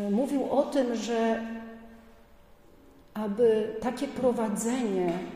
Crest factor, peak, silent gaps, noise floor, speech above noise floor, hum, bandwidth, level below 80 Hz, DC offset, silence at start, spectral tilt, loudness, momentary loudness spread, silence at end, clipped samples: 16 dB; -12 dBFS; none; -55 dBFS; 28 dB; none; 15.5 kHz; -60 dBFS; under 0.1%; 0 s; -5.5 dB/octave; -28 LUFS; 14 LU; 0 s; under 0.1%